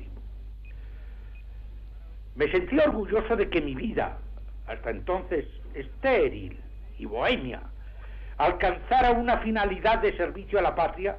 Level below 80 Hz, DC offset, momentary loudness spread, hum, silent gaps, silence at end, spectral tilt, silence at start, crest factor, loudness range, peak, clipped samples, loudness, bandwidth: -38 dBFS; under 0.1%; 21 LU; none; none; 0 s; -8 dB/octave; 0 s; 14 dB; 5 LU; -14 dBFS; under 0.1%; -26 LUFS; 5.8 kHz